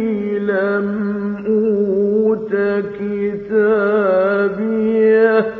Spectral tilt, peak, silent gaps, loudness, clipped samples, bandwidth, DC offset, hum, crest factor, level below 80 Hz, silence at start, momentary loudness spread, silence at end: -9.5 dB/octave; -2 dBFS; none; -16 LUFS; under 0.1%; 4.6 kHz; under 0.1%; none; 14 dB; -56 dBFS; 0 s; 8 LU; 0 s